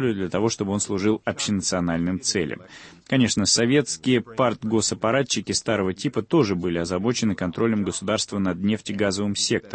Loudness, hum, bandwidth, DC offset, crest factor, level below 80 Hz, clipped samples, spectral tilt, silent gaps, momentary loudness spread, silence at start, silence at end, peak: -23 LUFS; none; 8.8 kHz; under 0.1%; 18 dB; -54 dBFS; under 0.1%; -4 dB/octave; none; 5 LU; 0 s; 0.05 s; -6 dBFS